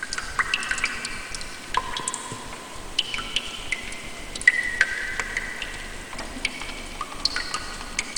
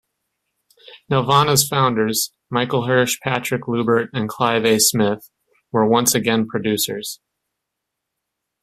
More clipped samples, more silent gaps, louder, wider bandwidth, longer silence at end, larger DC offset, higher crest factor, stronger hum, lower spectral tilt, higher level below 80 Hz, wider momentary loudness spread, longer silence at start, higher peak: neither; neither; second, -27 LUFS vs -18 LUFS; first, 19.5 kHz vs 16 kHz; second, 0 s vs 1.45 s; neither; first, 28 dB vs 20 dB; neither; second, -1 dB/octave vs -3.5 dB/octave; first, -42 dBFS vs -56 dBFS; first, 13 LU vs 8 LU; second, 0 s vs 0.9 s; about the same, 0 dBFS vs 0 dBFS